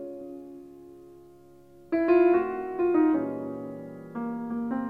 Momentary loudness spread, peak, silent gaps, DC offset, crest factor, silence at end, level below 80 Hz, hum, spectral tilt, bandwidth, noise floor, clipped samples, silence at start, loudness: 22 LU; -10 dBFS; none; under 0.1%; 18 dB; 0 s; -64 dBFS; none; -9 dB/octave; 4.9 kHz; -53 dBFS; under 0.1%; 0 s; -26 LUFS